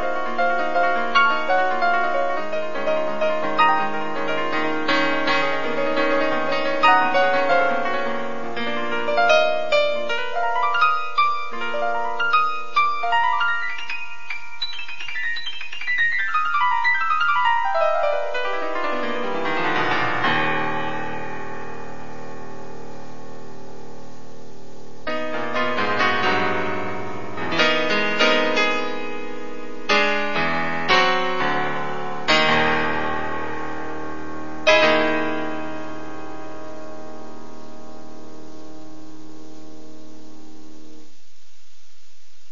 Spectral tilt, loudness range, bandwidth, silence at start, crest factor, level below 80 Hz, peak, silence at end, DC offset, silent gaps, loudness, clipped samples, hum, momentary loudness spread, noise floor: -4 dB/octave; 15 LU; 7.4 kHz; 0 s; 20 dB; -56 dBFS; -2 dBFS; 1.5 s; 6%; none; -21 LUFS; under 0.1%; none; 20 LU; -57 dBFS